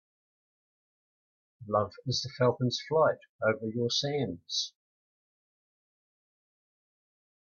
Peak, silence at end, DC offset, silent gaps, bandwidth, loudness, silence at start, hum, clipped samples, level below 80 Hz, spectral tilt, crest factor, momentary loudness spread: -12 dBFS; 2.75 s; under 0.1%; 3.29-3.39 s; 7.2 kHz; -30 LUFS; 1.6 s; none; under 0.1%; -72 dBFS; -4.5 dB/octave; 20 dB; 6 LU